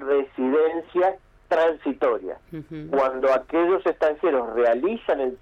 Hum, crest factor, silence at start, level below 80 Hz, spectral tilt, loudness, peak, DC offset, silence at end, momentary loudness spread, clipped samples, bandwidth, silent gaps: none; 10 dB; 0 s; -56 dBFS; -7 dB/octave; -23 LUFS; -12 dBFS; under 0.1%; 0.05 s; 8 LU; under 0.1%; 7.4 kHz; none